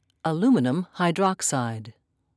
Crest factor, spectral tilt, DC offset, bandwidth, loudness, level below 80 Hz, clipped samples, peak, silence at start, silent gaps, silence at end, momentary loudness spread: 16 dB; -5 dB/octave; under 0.1%; 11 kHz; -24 LUFS; -74 dBFS; under 0.1%; -10 dBFS; 0.25 s; none; 0.45 s; 9 LU